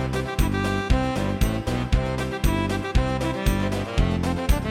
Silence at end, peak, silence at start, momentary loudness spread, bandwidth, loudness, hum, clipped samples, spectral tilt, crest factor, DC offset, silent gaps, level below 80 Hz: 0 s; -6 dBFS; 0 s; 2 LU; 16.5 kHz; -24 LUFS; none; under 0.1%; -6 dB/octave; 18 dB; under 0.1%; none; -26 dBFS